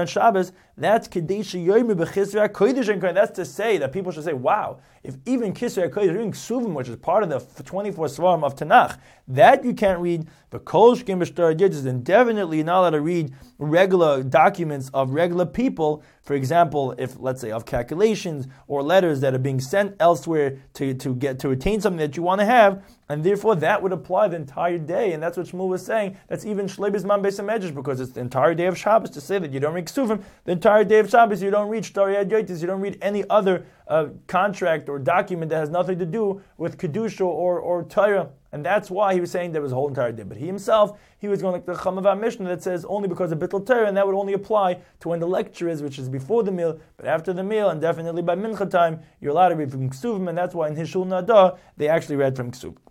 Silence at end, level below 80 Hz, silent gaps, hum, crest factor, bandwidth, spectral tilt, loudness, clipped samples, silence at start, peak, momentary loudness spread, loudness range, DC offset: 0.15 s; -54 dBFS; none; none; 20 dB; 16 kHz; -6.5 dB/octave; -22 LUFS; under 0.1%; 0 s; -2 dBFS; 11 LU; 5 LU; under 0.1%